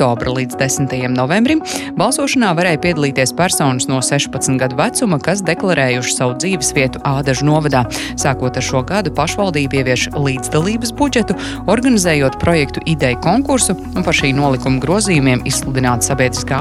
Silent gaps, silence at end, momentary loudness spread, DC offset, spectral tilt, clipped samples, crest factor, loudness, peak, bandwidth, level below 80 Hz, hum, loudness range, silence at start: none; 0 s; 4 LU; under 0.1%; -4.5 dB/octave; under 0.1%; 14 dB; -15 LUFS; 0 dBFS; 13.5 kHz; -34 dBFS; none; 2 LU; 0 s